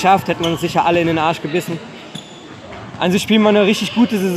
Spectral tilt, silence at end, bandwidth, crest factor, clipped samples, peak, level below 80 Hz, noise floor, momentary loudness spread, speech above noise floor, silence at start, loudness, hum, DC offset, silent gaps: -5.5 dB/octave; 0 s; 15.5 kHz; 16 dB; under 0.1%; 0 dBFS; -52 dBFS; -35 dBFS; 20 LU; 20 dB; 0 s; -16 LUFS; none; under 0.1%; none